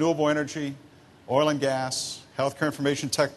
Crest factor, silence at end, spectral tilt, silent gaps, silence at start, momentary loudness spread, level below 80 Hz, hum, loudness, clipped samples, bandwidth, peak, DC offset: 20 dB; 0 s; -4.5 dB/octave; none; 0 s; 10 LU; -66 dBFS; none; -27 LUFS; under 0.1%; 12.5 kHz; -8 dBFS; under 0.1%